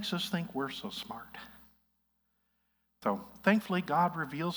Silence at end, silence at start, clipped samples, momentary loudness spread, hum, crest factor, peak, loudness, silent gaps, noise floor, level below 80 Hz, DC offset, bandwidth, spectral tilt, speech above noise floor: 0 s; 0 s; under 0.1%; 16 LU; 60 Hz at -65 dBFS; 22 dB; -12 dBFS; -33 LUFS; none; -78 dBFS; -70 dBFS; under 0.1%; over 20 kHz; -5.5 dB/octave; 45 dB